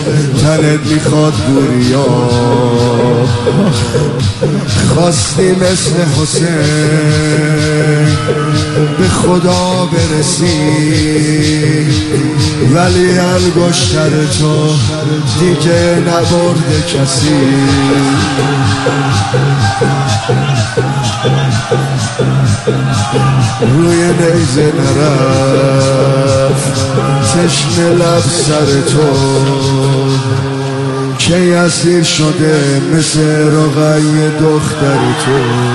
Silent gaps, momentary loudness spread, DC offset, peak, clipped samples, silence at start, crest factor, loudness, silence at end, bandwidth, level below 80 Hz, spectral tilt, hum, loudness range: none; 3 LU; under 0.1%; 0 dBFS; under 0.1%; 0 s; 10 dB; -10 LUFS; 0 s; 12 kHz; -34 dBFS; -5.5 dB/octave; none; 2 LU